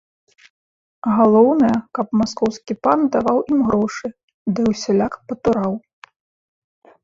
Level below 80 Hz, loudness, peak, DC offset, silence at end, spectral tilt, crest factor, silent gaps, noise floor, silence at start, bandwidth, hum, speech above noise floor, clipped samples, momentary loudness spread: -52 dBFS; -18 LUFS; -2 dBFS; under 0.1%; 1.25 s; -6.5 dB/octave; 18 dB; 4.23-4.28 s, 4.34-4.46 s; under -90 dBFS; 1.05 s; 7.6 kHz; none; over 73 dB; under 0.1%; 11 LU